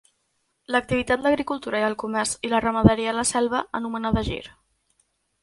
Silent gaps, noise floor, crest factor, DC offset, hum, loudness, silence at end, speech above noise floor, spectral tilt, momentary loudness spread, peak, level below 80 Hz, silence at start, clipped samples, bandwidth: none; -72 dBFS; 24 dB; under 0.1%; none; -23 LUFS; 0.95 s; 49 dB; -4.5 dB/octave; 8 LU; 0 dBFS; -42 dBFS; 0.7 s; under 0.1%; 11.5 kHz